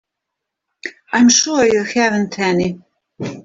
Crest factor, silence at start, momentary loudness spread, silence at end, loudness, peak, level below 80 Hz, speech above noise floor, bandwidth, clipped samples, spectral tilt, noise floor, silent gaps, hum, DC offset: 16 dB; 0.85 s; 20 LU; 0.05 s; -15 LUFS; 0 dBFS; -54 dBFS; 65 dB; 7.8 kHz; under 0.1%; -3 dB/octave; -80 dBFS; none; none; under 0.1%